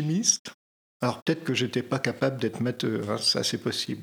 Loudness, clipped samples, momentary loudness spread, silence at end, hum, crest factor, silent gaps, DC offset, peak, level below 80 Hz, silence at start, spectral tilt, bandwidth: -27 LUFS; under 0.1%; 6 LU; 0 s; none; 22 dB; 0.39-0.45 s, 0.54-1.00 s, 1.22-1.26 s; under 0.1%; -6 dBFS; -72 dBFS; 0 s; -3.5 dB/octave; over 20 kHz